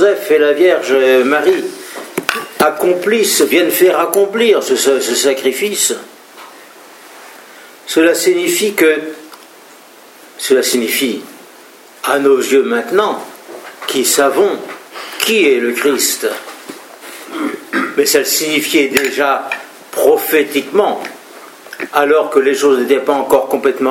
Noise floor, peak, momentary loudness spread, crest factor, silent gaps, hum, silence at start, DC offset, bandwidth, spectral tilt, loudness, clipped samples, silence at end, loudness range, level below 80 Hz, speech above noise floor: -40 dBFS; 0 dBFS; 16 LU; 14 dB; none; none; 0 s; under 0.1%; 17 kHz; -2 dB/octave; -13 LUFS; under 0.1%; 0 s; 4 LU; -64 dBFS; 27 dB